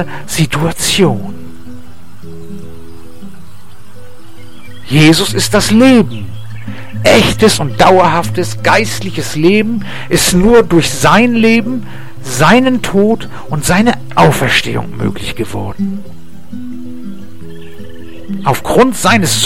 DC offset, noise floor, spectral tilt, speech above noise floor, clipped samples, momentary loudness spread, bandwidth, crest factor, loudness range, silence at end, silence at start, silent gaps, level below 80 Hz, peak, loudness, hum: 8%; -38 dBFS; -4.5 dB/octave; 28 dB; under 0.1%; 22 LU; 16.5 kHz; 12 dB; 10 LU; 0 s; 0 s; none; -34 dBFS; 0 dBFS; -11 LUFS; none